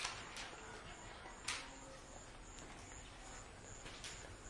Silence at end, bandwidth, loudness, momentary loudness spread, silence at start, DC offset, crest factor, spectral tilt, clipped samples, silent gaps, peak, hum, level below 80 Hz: 0 s; 11.5 kHz; -51 LUFS; 10 LU; 0 s; under 0.1%; 28 dB; -2 dB/octave; under 0.1%; none; -24 dBFS; none; -62 dBFS